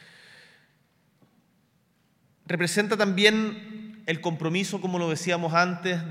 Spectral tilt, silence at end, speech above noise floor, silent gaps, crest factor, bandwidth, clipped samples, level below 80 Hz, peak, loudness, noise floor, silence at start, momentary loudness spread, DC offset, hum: -4.5 dB/octave; 0 s; 42 dB; none; 24 dB; 16 kHz; under 0.1%; -76 dBFS; -4 dBFS; -25 LUFS; -67 dBFS; 2.45 s; 12 LU; under 0.1%; none